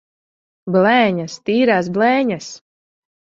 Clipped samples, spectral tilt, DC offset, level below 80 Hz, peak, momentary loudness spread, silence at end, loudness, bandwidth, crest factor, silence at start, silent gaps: under 0.1%; -5.5 dB/octave; under 0.1%; -62 dBFS; -2 dBFS; 14 LU; 0.7 s; -16 LUFS; 7.8 kHz; 16 dB; 0.65 s; none